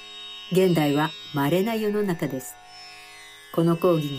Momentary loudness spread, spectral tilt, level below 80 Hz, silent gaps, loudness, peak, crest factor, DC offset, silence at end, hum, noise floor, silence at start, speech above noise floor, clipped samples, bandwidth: 21 LU; -6 dB/octave; -64 dBFS; none; -24 LUFS; -8 dBFS; 16 dB; under 0.1%; 0 s; none; -45 dBFS; 0 s; 23 dB; under 0.1%; 15.5 kHz